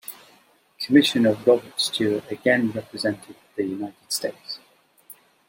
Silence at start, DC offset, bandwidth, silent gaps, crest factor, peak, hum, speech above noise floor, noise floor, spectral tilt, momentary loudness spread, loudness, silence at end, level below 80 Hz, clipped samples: 0.1 s; under 0.1%; 16.5 kHz; none; 20 dB; -4 dBFS; none; 35 dB; -58 dBFS; -4 dB/octave; 18 LU; -22 LUFS; 0.9 s; -70 dBFS; under 0.1%